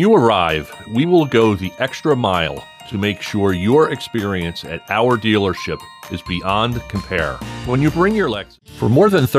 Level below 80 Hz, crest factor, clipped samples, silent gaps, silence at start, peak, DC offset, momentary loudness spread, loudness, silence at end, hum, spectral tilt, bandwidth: -40 dBFS; 14 dB; under 0.1%; none; 0 s; -2 dBFS; under 0.1%; 13 LU; -17 LUFS; 0 s; none; -6.5 dB/octave; 15 kHz